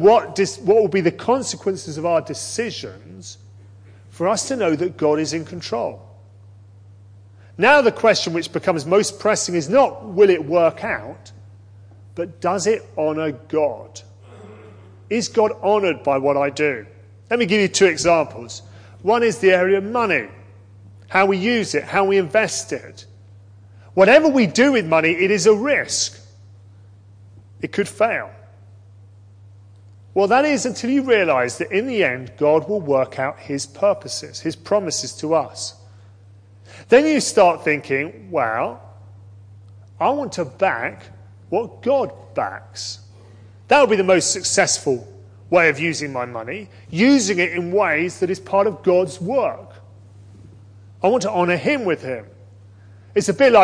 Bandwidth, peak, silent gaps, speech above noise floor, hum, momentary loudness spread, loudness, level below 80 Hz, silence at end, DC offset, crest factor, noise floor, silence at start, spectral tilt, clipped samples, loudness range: 10.5 kHz; 0 dBFS; none; 28 dB; none; 13 LU; -19 LUFS; -60 dBFS; 0 s; under 0.1%; 20 dB; -46 dBFS; 0 s; -4 dB/octave; under 0.1%; 7 LU